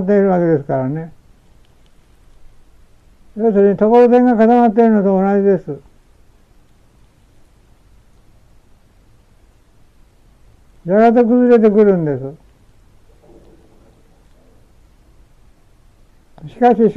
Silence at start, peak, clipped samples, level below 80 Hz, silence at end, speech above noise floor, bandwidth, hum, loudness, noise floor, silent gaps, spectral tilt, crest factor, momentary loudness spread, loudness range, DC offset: 0 s; -2 dBFS; under 0.1%; -48 dBFS; 0 s; 37 dB; 6 kHz; none; -13 LUFS; -49 dBFS; none; -10 dB/octave; 14 dB; 17 LU; 10 LU; under 0.1%